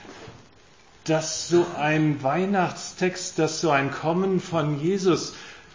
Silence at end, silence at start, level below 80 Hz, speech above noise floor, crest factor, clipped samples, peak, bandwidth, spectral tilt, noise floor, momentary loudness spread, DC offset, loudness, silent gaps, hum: 0.15 s; 0 s; -62 dBFS; 30 dB; 18 dB; under 0.1%; -8 dBFS; 7.6 kHz; -5 dB/octave; -54 dBFS; 7 LU; 0.1%; -24 LUFS; none; none